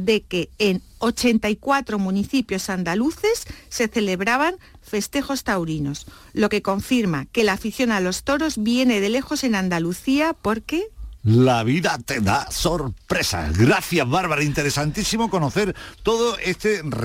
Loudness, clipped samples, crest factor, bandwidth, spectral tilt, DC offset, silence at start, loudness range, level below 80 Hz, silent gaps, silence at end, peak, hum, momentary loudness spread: -21 LUFS; under 0.1%; 14 dB; 16.5 kHz; -5 dB/octave; under 0.1%; 0 s; 3 LU; -42 dBFS; none; 0 s; -6 dBFS; none; 7 LU